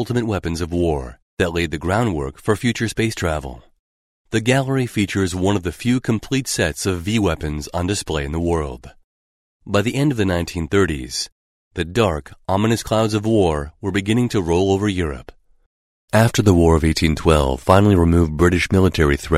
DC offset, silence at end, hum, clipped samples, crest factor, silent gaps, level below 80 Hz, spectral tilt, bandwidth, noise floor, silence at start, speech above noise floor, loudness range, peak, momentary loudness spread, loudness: under 0.1%; 0 s; none; under 0.1%; 18 dB; 1.22-1.37 s, 3.79-4.25 s, 9.04-9.60 s, 11.32-11.71 s, 15.66-16.08 s; -36 dBFS; -5.5 dB/octave; 15.5 kHz; under -90 dBFS; 0 s; over 72 dB; 6 LU; 0 dBFS; 10 LU; -19 LUFS